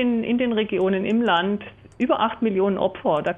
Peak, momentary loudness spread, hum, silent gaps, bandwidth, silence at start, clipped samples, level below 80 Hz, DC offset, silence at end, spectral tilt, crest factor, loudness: -8 dBFS; 7 LU; none; none; 7.4 kHz; 0 s; under 0.1%; -56 dBFS; under 0.1%; 0 s; -7.5 dB/octave; 14 dB; -22 LUFS